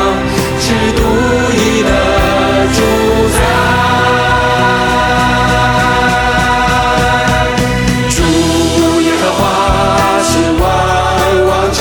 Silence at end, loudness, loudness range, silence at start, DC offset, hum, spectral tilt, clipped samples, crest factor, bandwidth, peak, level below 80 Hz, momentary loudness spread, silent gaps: 0 s; -10 LUFS; 1 LU; 0 s; under 0.1%; none; -4.5 dB/octave; under 0.1%; 10 dB; 19.5 kHz; 0 dBFS; -22 dBFS; 2 LU; none